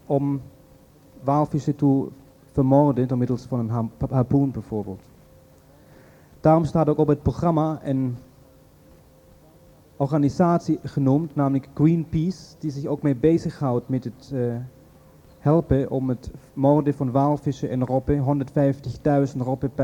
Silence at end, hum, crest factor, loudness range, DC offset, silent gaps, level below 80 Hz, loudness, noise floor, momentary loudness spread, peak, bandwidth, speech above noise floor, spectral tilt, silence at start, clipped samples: 0 s; none; 18 dB; 4 LU; under 0.1%; none; -46 dBFS; -23 LUFS; -52 dBFS; 11 LU; -4 dBFS; 9.4 kHz; 30 dB; -9.5 dB/octave; 0.1 s; under 0.1%